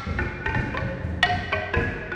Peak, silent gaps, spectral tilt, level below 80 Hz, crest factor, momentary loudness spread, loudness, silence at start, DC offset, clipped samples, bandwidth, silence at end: -6 dBFS; none; -6 dB/octave; -36 dBFS; 20 dB; 6 LU; -26 LUFS; 0 s; under 0.1%; under 0.1%; 10.5 kHz; 0 s